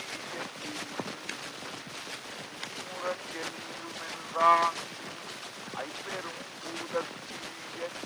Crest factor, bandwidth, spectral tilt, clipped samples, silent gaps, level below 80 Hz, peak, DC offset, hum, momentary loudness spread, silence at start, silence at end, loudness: 24 dB; over 20 kHz; -2.5 dB/octave; under 0.1%; none; -76 dBFS; -10 dBFS; under 0.1%; none; 14 LU; 0 s; 0 s; -34 LUFS